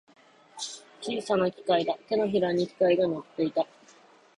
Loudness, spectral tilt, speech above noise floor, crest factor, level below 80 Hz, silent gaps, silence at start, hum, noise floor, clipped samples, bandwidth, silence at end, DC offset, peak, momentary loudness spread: -28 LUFS; -5 dB/octave; 30 dB; 16 dB; -70 dBFS; none; 0.55 s; none; -57 dBFS; under 0.1%; 11 kHz; 0.75 s; under 0.1%; -12 dBFS; 13 LU